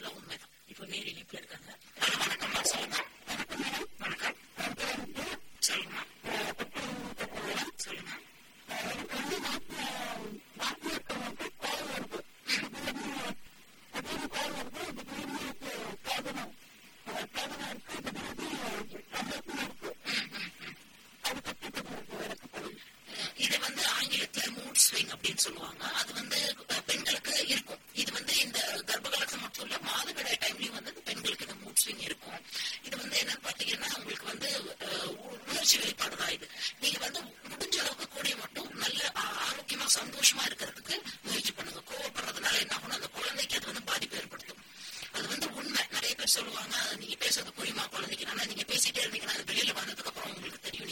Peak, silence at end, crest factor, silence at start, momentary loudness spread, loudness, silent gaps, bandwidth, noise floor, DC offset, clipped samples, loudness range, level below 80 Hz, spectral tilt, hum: -10 dBFS; 0 s; 26 dB; 0 s; 13 LU; -33 LUFS; none; 16.5 kHz; -56 dBFS; under 0.1%; under 0.1%; 9 LU; -66 dBFS; -0.5 dB/octave; none